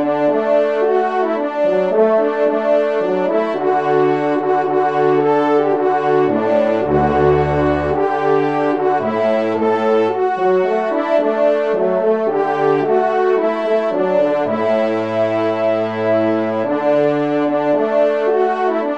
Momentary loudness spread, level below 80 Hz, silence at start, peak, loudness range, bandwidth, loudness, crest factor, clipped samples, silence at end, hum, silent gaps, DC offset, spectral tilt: 3 LU; -44 dBFS; 0 s; -2 dBFS; 2 LU; 7.8 kHz; -16 LUFS; 12 dB; under 0.1%; 0 s; none; none; 0.3%; -8 dB/octave